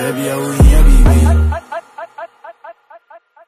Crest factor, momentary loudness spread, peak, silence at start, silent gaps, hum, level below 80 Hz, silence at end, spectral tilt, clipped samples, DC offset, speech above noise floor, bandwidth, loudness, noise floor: 12 dB; 22 LU; 0 dBFS; 0 s; none; none; -12 dBFS; 0.75 s; -6.5 dB/octave; under 0.1%; under 0.1%; 35 dB; 15 kHz; -12 LUFS; -43 dBFS